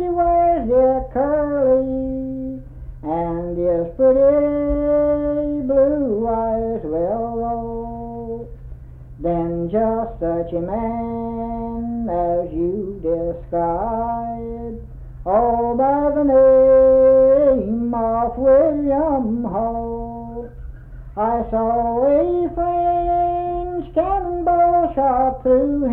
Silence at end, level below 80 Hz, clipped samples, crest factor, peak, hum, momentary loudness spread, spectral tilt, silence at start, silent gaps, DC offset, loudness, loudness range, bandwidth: 0 s; -36 dBFS; under 0.1%; 12 dB; -6 dBFS; none; 15 LU; -11.5 dB/octave; 0 s; none; under 0.1%; -18 LUFS; 9 LU; 3.4 kHz